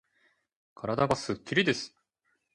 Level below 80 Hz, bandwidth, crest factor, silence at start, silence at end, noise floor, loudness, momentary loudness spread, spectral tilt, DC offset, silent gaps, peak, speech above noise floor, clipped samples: -62 dBFS; 11.5 kHz; 22 dB; 0.8 s; 0.65 s; -77 dBFS; -29 LUFS; 11 LU; -4.5 dB/octave; under 0.1%; none; -10 dBFS; 48 dB; under 0.1%